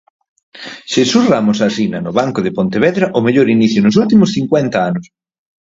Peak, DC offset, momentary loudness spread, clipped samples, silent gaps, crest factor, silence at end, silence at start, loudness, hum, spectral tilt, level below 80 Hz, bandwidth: 0 dBFS; under 0.1%; 8 LU; under 0.1%; none; 14 dB; 0.75 s; 0.55 s; -13 LUFS; none; -6 dB/octave; -52 dBFS; 7.8 kHz